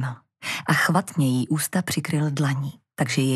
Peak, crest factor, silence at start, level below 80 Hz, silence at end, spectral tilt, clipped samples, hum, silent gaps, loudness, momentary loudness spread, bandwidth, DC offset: -4 dBFS; 20 dB; 0 s; -66 dBFS; 0 s; -5 dB/octave; under 0.1%; none; none; -24 LUFS; 10 LU; 14.5 kHz; under 0.1%